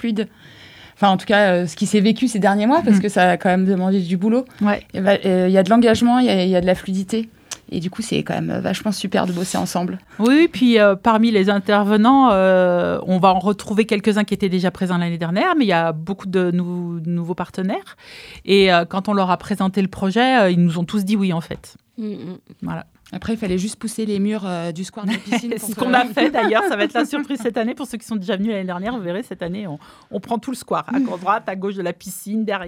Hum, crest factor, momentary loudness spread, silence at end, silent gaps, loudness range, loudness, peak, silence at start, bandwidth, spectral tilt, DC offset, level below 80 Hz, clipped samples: none; 18 dB; 14 LU; 0 s; none; 9 LU; -18 LUFS; 0 dBFS; 0 s; 15.5 kHz; -6 dB/octave; under 0.1%; -52 dBFS; under 0.1%